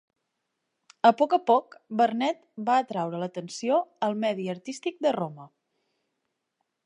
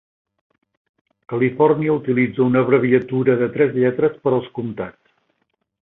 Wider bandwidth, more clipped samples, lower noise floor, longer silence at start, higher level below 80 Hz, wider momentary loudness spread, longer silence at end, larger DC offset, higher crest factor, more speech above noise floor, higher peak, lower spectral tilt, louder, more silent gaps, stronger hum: first, 10.5 kHz vs 4 kHz; neither; first, -81 dBFS vs -70 dBFS; second, 1.05 s vs 1.3 s; second, -82 dBFS vs -60 dBFS; about the same, 12 LU vs 12 LU; first, 1.4 s vs 1 s; neither; about the same, 22 dB vs 18 dB; about the same, 55 dB vs 53 dB; second, -6 dBFS vs -2 dBFS; second, -5.5 dB/octave vs -11.5 dB/octave; second, -26 LUFS vs -18 LUFS; neither; neither